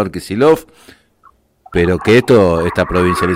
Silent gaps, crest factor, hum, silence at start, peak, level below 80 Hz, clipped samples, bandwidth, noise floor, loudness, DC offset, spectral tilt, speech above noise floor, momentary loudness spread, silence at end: none; 12 dB; none; 0 s; -2 dBFS; -38 dBFS; under 0.1%; 16 kHz; -51 dBFS; -13 LUFS; under 0.1%; -6.5 dB/octave; 38 dB; 8 LU; 0 s